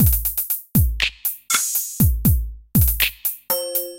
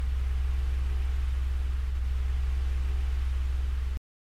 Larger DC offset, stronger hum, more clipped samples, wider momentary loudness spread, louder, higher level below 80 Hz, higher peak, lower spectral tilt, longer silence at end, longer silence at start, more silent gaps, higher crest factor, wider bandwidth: neither; neither; neither; first, 6 LU vs 1 LU; first, -19 LUFS vs -32 LUFS; about the same, -26 dBFS vs -28 dBFS; first, -4 dBFS vs -20 dBFS; second, -4 dB/octave vs -6.5 dB/octave; second, 0 s vs 0.35 s; about the same, 0 s vs 0 s; neither; first, 16 dB vs 8 dB; first, 17.5 kHz vs 6.4 kHz